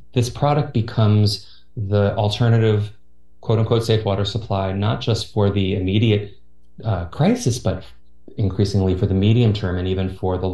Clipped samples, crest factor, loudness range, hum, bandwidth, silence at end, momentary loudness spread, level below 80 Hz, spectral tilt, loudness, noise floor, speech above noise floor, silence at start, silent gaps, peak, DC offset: under 0.1%; 16 dB; 2 LU; none; 12 kHz; 0 s; 9 LU; -44 dBFS; -7 dB/octave; -20 LUFS; -47 dBFS; 28 dB; 0.15 s; none; -4 dBFS; 1%